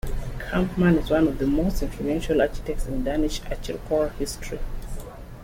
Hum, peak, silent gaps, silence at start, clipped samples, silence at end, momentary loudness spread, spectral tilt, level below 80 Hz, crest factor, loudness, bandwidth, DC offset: none; -8 dBFS; none; 0.05 s; under 0.1%; 0 s; 15 LU; -6.5 dB/octave; -32 dBFS; 16 dB; -25 LUFS; 16.5 kHz; under 0.1%